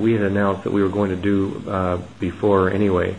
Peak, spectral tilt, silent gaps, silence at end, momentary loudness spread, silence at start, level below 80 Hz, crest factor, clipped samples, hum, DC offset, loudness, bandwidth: -4 dBFS; -8.5 dB/octave; none; 0 s; 6 LU; 0 s; -48 dBFS; 16 dB; under 0.1%; none; 0.4%; -20 LUFS; 10.5 kHz